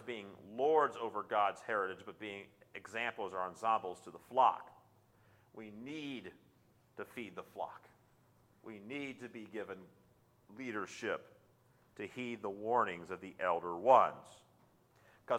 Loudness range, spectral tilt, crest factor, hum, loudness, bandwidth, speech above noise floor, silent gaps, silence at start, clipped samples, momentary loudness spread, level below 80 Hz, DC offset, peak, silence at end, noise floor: 14 LU; -5 dB/octave; 26 dB; none; -37 LUFS; 16 kHz; 32 dB; none; 0 s; under 0.1%; 21 LU; -82 dBFS; under 0.1%; -14 dBFS; 0 s; -70 dBFS